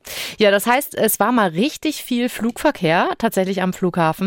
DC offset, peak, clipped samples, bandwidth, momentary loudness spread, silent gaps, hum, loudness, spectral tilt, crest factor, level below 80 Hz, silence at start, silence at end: under 0.1%; -2 dBFS; under 0.1%; 17 kHz; 6 LU; none; none; -18 LUFS; -4.5 dB/octave; 16 dB; -52 dBFS; 0.05 s; 0 s